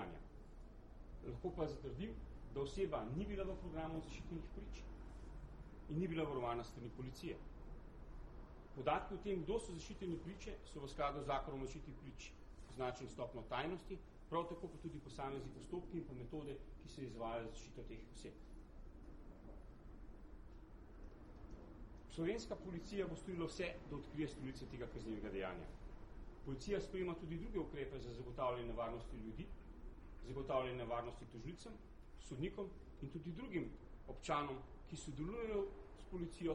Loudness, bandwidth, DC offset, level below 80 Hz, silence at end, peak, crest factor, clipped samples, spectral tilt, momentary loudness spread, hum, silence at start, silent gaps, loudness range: -47 LUFS; 12 kHz; under 0.1%; -56 dBFS; 0 s; -24 dBFS; 22 dB; under 0.1%; -6 dB/octave; 17 LU; none; 0 s; none; 6 LU